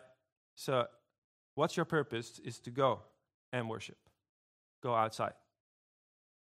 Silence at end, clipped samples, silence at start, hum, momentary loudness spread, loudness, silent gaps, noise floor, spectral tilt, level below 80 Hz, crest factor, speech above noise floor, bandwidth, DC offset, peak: 1.1 s; under 0.1%; 0.55 s; none; 12 LU; -37 LUFS; 1.18-1.57 s, 3.34-3.52 s, 4.29-4.82 s; under -90 dBFS; -5.5 dB/octave; -80 dBFS; 22 dB; over 54 dB; 15.5 kHz; under 0.1%; -16 dBFS